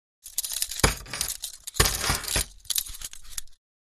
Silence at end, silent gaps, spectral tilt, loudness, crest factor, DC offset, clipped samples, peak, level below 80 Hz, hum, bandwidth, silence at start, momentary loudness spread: 0.45 s; none; -1.5 dB/octave; -27 LUFS; 26 dB; under 0.1%; under 0.1%; -2 dBFS; -38 dBFS; none; 15 kHz; 0.25 s; 14 LU